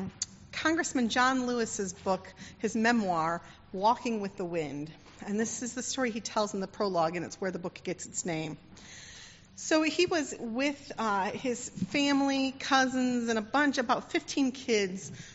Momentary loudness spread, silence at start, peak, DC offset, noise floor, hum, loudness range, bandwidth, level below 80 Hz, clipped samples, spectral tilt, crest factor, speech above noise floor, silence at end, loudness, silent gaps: 13 LU; 0 s; -12 dBFS; under 0.1%; -51 dBFS; none; 5 LU; 8 kHz; -64 dBFS; under 0.1%; -3 dB/octave; 20 dB; 20 dB; 0 s; -30 LUFS; none